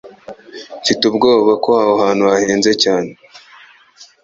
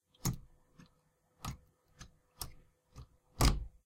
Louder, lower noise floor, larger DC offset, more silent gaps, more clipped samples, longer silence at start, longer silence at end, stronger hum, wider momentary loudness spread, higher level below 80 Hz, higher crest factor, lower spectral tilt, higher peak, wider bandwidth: first, -13 LUFS vs -38 LUFS; second, -45 dBFS vs -74 dBFS; neither; neither; neither; second, 0.05 s vs 0.25 s; about the same, 0.2 s vs 0.15 s; neither; second, 17 LU vs 26 LU; second, -56 dBFS vs -44 dBFS; second, 14 dB vs 26 dB; about the same, -3.5 dB/octave vs -4 dB/octave; first, 0 dBFS vs -14 dBFS; second, 7.8 kHz vs 16.5 kHz